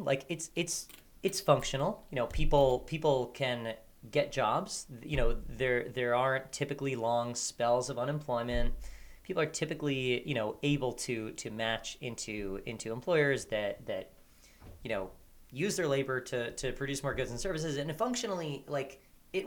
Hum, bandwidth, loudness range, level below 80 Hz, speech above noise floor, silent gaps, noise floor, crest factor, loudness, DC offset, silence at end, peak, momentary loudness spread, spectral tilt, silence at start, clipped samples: none; 20 kHz; 4 LU; -44 dBFS; 25 dB; none; -58 dBFS; 22 dB; -34 LUFS; under 0.1%; 0 s; -10 dBFS; 11 LU; -4.5 dB/octave; 0 s; under 0.1%